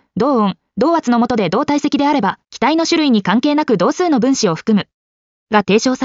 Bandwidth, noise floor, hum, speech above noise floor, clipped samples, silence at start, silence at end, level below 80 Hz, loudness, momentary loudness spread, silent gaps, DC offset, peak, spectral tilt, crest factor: 7.6 kHz; under -90 dBFS; none; over 76 dB; under 0.1%; 0.15 s; 0 s; -54 dBFS; -15 LUFS; 4 LU; 4.94-5.47 s; under 0.1%; 0 dBFS; -4.5 dB/octave; 14 dB